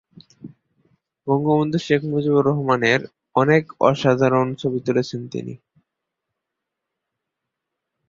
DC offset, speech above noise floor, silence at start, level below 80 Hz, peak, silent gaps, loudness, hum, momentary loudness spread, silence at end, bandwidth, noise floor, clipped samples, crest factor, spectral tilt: under 0.1%; 63 dB; 0.45 s; -60 dBFS; -2 dBFS; none; -20 LUFS; none; 11 LU; 2.55 s; 7.6 kHz; -82 dBFS; under 0.1%; 20 dB; -7 dB/octave